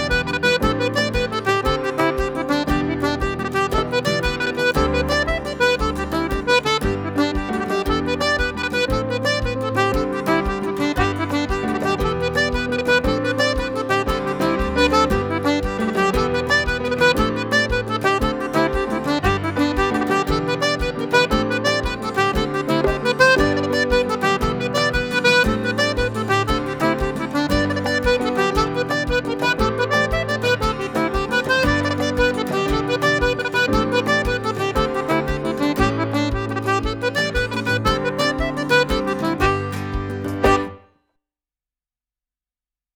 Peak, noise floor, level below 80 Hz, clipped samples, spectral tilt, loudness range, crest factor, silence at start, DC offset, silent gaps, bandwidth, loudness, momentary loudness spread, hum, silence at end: 0 dBFS; under -90 dBFS; -32 dBFS; under 0.1%; -5 dB/octave; 2 LU; 20 dB; 0 s; under 0.1%; none; over 20 kHz; -20 LUFS; 5 LU; none; 2.2 s